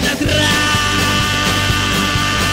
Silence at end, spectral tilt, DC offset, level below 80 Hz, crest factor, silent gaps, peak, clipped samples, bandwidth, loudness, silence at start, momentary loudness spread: 0 s; -3 dB/octave; under 0.1%; -28 dBFS; 14 dB; none; -2 dBFS; under 0.1%; 16.5 kHz; -14 LUFS; 0 s; 2 LU